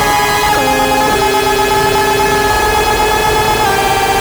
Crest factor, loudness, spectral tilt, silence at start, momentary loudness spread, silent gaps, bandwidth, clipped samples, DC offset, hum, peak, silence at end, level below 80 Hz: 10 dB; -11 LUFS; -3 dB/octave; 0 s; 0 LU; none; over 20 kHz; under 0.1%; under 0.1%; none; 0 dBFS; 0 s; -28 dBFS